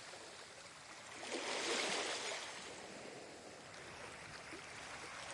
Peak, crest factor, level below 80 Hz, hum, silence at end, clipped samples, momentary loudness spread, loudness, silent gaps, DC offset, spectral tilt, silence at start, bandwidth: -28 dBFS; 20 dB; -78 dBFS; none; 0 s; under 0.1%; 15 LU; -45 LUFS; none; under 0.1%; -1 dB/octave; 0 s; 11.5 kHz